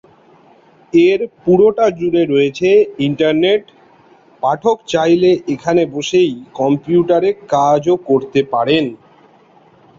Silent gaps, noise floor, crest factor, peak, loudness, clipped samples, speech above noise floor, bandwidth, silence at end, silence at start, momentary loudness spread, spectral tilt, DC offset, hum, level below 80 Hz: none; -48 dBFS; 14 dB; -2 dBFS; -14 LUFS; under 0.1%; 34 dB; 7.6 kHz; 1.05 s; 0.95 s; 5 LU; -6 dB/octave; under 0.1%; none; -54 dBFS